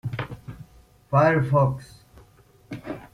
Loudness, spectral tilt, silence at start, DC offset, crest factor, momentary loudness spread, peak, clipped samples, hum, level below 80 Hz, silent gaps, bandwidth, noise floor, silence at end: -22 LUFS; -8.5 dB/octave; 0.05 s; under 0.1%; 18 dB; 22 LU; -6 dBFS; under 0.1%; none; -52 dBFS; none; 11 kHz; -55 dBFS; 0.05 s